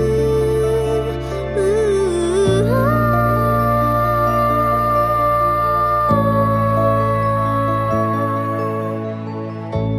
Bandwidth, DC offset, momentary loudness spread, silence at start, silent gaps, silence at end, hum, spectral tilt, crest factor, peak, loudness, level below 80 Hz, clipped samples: 15 kHz; under 0.1%; 7 LU; 0 s; none; 0 s; none; -7.5 dB/octave; 12 dB; -4 dBFS; -17 LUFS; -32 dBFS; under 0.1%